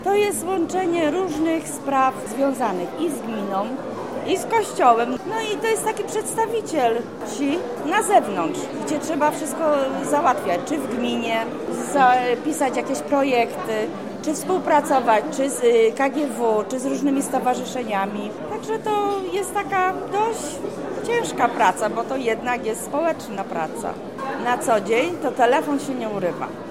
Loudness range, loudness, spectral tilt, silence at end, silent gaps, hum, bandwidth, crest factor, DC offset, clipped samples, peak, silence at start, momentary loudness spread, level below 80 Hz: 3 LU; -22 LUFS; -4 dB/octave; 0 s; none; none; 16.5 kHz; 20 dB; 0.3%; under 0.1%; -2 dBFS; 0 s; 9 LU; -60 dBFS